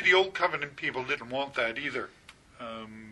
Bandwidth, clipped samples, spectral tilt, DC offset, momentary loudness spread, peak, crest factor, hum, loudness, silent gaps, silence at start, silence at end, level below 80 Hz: 11 kHz; under 0.1%; -3.5 dB/octave; under 0.1%; 17 LU; -10 dBFS; 20 dB; none; -30 LUFS; none; 0 s; 0 s; -66 dBFS